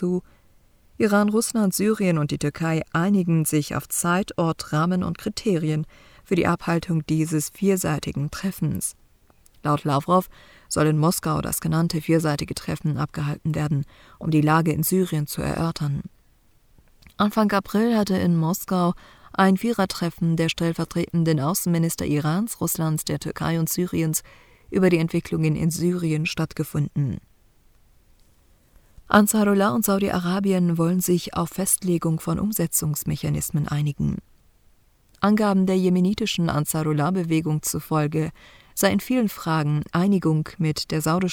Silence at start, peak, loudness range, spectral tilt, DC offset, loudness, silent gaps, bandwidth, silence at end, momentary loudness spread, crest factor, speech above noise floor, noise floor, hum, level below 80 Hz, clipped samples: 0 s; -2 dBFS; 3 LU; -5.5 dB/octave; under 0.1%; -23 LUFS; none; 19.5 kHz; 0 s; 7 LU; 20 dB; 36 dB; -58 dBFS; none; -50 dBFS; under 0.1%